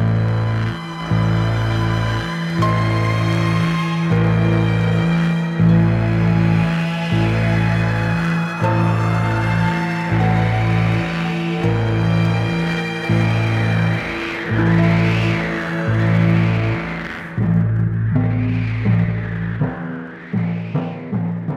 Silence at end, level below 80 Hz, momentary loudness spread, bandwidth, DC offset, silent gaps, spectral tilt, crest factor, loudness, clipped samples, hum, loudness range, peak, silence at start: 0 s; -36 dBFS; 7 LU; 8.8 kHz; under 0.1%; none; -7.5 dB/octave; 12 dB; -18 LUFS; under 0.1%; none; 3 LU; -4 dBFS; 0 s